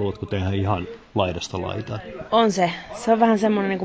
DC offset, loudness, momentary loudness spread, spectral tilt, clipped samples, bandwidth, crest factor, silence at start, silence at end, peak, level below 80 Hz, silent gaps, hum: under 0.1%; -22 LUFS; 11 LU; -6 dB/octave; under 0.1%; 8 kHz; 18 dB; 0 s; 0 s; -4 dBFS; -42 dBFS; none; none